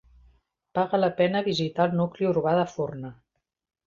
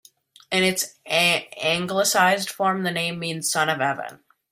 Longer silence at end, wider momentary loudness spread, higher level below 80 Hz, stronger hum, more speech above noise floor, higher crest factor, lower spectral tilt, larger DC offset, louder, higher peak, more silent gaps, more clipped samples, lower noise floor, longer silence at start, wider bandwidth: first, 0.75 s vs 0.35 s; about the same, 9 LU vs 7 LU; about the same, -62 dBFS vs -66 dBFS; neither; first, 38 dB vs 20 dB; about the same, 18 dB vs 20 dB; first, -7 dB/octave vs -2.5 dB/octave; neither; second, -25 LUFS vs -22 LUFS; second, -8 dBFS vs -4 dBFS; neither; neither; first, -62 dBFS vs -43 dBFS; first, 0.75 s vs 0.5 s; second, 7.4 kHz vs 16 kHz